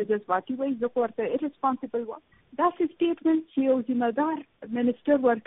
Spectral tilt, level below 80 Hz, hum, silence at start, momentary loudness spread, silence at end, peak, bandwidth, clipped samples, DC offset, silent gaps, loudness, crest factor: -1.5 dB/octave; -70 dBFS; none; 0 s; 9 LU; 0.05 s; -10 dBFS; 3.9 kHz; under 0.1%; under 0.1%; none; -27 LUFS; 16 dB